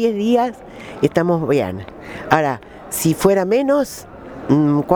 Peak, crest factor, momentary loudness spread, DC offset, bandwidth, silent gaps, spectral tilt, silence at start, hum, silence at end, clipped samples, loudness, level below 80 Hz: 0 dBFS; 18 dB; 17 LU; under 0.1%; over 20 kHz; none; -6 dB/octave; 0 s; none; 0 s; under 0.1%; -18 LUFS; -48 dBFS